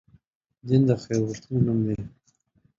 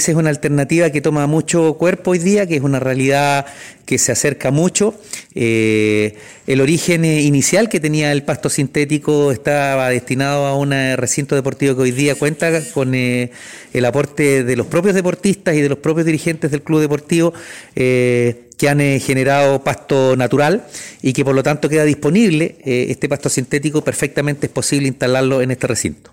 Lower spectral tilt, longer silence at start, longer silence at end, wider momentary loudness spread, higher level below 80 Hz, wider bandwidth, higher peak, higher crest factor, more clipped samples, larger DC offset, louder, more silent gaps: first, -8 dB/octave vs -5 dB/octave; first, 0.65 s vs 0 s; first, 0.7 s vs 0.15 s; first, 15 LU vs 5 LU; about the same, -54 dBFS vs -50 dBFS; second, 7.6 kHz vs 16.5 kHz; second, -8 dBFS vs -2 dBFS; about the same, 18 dB vs 14 dB; neither; second, under 0.1% vs 0.1%; second, -25 LUFS vs -15 LUFS; neither